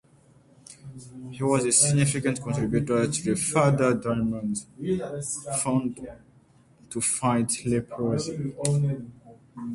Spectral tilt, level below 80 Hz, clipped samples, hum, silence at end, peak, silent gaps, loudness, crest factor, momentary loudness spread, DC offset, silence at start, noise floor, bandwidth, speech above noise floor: -5 dB/octave; -54 dBFS; under 0.1%; none; 0 s; -6 dBFS; none; -25 LUFS; 20 dB; 20 LU; under 0.1%; 0.7 s; -58 dBFS; 11.5 kHz; 32 dB